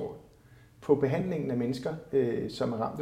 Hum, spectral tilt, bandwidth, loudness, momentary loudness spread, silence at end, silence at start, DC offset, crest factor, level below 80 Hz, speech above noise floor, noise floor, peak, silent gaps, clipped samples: none; -7.5 dB/octave; 13.5 kHz; -30 LUFS; 12 LU; 0 s; 0 s; under 0.1%; 20 dB; -60 dBFS; 27 dB; -57 dBFS; -10 dBFS; none; under 0.1%